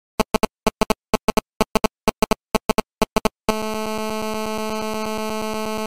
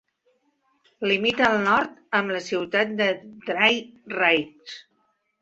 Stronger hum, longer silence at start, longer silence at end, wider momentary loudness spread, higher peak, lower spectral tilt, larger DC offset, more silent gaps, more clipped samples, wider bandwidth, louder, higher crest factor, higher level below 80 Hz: neither; second, 0.15 s vs 1 s; second, 0 s vs 0.6 s; second, 4 LU vs 14 LU; about the same, -2 dBFS vs -4 dBFS; about the same, -4 dB/octave vs -4 dB/octave; first, 1% vs under 0.1%; first, 1.23-1.28 s, 1.55-1.60 s, 1.71-1.75 s, 2.65-2.69 s, 3.12-3.16 s vs none; neither; first, 17 kHz vs 8 kHz; about the same, -23 LUFS vs -22 LUFS; about the same, 20 dB vs 22 dB; first, -36 dBFS vs -64 dBFS